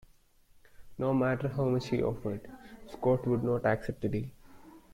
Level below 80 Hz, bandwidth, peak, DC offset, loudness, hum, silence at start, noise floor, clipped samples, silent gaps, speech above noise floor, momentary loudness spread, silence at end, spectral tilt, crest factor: -54 dBFS; 15 kHz; -14 dBFS; under 0.1%; -31 LUFS; none; 0.8 s; -62 dBFS; under 0.1%; none; 32 dB; 18 LU; 0.15 s; -8.5 dB/octave; 18 dB